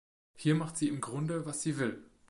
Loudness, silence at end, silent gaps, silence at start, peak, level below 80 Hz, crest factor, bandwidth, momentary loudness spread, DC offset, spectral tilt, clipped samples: -34 LUFS; 0.05 s; none; 0.35 s; -16 dBFS; -70 dBFS; 18 dB; 11.5 kHz; 5 LU; under 0.1%; -5.5 dB/octave; under 0.1%